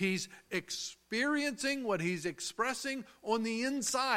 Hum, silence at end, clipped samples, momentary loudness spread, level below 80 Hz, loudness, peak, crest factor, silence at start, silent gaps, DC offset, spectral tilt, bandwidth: none; 0 s; under 0.1%; 7 LU; -72 dBFS; -35 LUFS; -16 dBFS; 18 dB; 0 s; none; under 0.1%; -3 dB/octave; 16.5 kHz